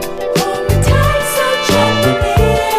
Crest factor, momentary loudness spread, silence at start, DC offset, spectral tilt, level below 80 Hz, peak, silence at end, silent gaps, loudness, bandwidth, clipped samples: 12 dB; 4 LU; 0 s; under 0.1%; -5 dB/octave; -22 dBFS; 0 dBFS; 0 s; none; -13 LUFS; 15.5 kHz; under 0.1%